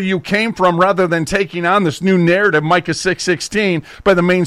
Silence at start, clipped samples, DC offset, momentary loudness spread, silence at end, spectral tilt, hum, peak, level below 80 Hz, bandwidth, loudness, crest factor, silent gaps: 0 s; under 0.1%; under 0.1%; 5 LU; 0 s; -5.5 dB/octave; none; -2 dBFS; -44 dBFS; 13.5 kHz; -15 LUFS; 12 dB; none